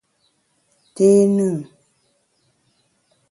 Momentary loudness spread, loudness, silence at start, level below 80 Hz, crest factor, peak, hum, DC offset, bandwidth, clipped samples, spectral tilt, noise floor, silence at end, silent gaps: 17 LU; -17 LUFS; 1 s; -68 dBFS; 18 dB; -4 dBFS; none; under 0.1%; 11.5 kHz; under 0.1%; -8 dB/octave; -66 dBFS; 1.7 s; none